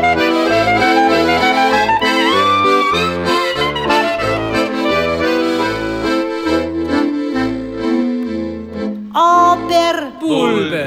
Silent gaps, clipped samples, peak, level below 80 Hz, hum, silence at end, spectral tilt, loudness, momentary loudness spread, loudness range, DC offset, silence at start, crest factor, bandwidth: none; under 0.1%; 0 dBFS; -40 dBFS; none; 0 s; -4.5 dB/octave; -14 LUFS; 8 LU; 5 LU; under 0.1%; 0 s; 14 dB; 16 kHz